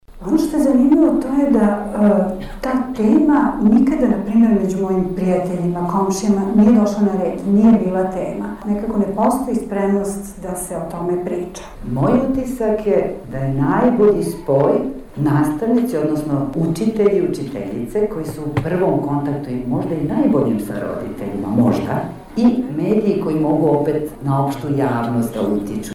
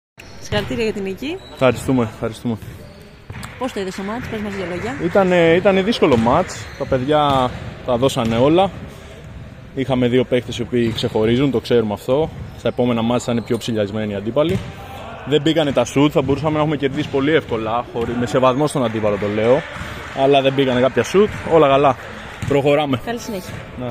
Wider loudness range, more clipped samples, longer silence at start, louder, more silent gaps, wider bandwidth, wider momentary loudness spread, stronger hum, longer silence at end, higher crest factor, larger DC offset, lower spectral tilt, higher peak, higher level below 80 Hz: about the same, 5 LU vs 6 LU; neither; about the same, 0.1 s vs 0.2 s; about the same, -18 LUFS vs -18 LUFS; neither; about the same, 14.5 kHz vs 15.5 kHz; second, 11 LU vs 14 LU; neither; about the same, 0 s vs 0 s; about the same, 12 dB vs 16 dB; neither; first, -8 dB/octave vs -6 dB/octave; second, -6 dBFS vs -2 dBFS; about the same, -40 dBFS vs -42 dBFS